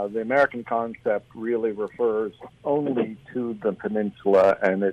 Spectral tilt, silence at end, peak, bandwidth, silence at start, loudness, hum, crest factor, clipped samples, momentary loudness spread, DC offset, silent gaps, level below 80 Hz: -8 dB/octave; 0 s; -8 dBFS; 8.6 kHz; 0 s; -24 LUFS; none; 14 dB; under 0.1%; 10 LU; under 0.1%; none; -64 dBFS